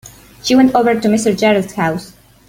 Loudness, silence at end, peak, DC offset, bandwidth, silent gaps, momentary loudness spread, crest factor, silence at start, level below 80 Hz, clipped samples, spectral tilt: -14 LUFS; 0.4 s; 0 dBFS; under 0.1%; 16.5 kHz; none; 9 LU; 14 dB; 0.05 s; -48 dBFS; under 0.1%; -5 dB/octave